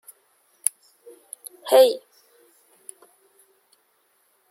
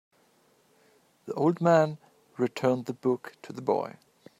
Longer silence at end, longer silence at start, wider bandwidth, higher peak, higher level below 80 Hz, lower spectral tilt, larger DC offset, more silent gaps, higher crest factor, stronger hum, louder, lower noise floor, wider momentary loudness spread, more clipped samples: first, 2.5 s vs 0.5 s; first, 1.65 s vs 1.25 s; about the same, 16.5 kHz vs 15 kHz; first, 0 dBFS vs -8 dBFS; second, under -90 dBFS vs -76 dBFS; second, 0.5 dB/octave vs -7.5 dB/octave; neither; neither; about the same, 26 dB vs 22 dB; neither; first, -20 LUFS vs -28 LUFS; about the same, -66 dBFS vs -65 dBFS; first, 27 LU vs 20 LU; neither